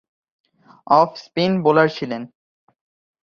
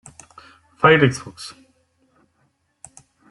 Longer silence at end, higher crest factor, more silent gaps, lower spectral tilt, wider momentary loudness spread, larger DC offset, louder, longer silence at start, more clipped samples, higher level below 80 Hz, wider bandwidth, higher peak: second, 0.95 s vs 1.8 s; about the same, 20 dB vs 22 dB; neither; first, -7 dB/octave vs -5.5 dB/octave; second, 13 LU vs 23 LU; neither; about the same, -18 LUFS vs -16 LUFS; about the same, 0.9 s vs 0.8 s; neither; second, -64 dBFS vs -58 dBFS; second, 7 kHz vs 12 kHz; about the same, -2 dBFS vs -2 dBFS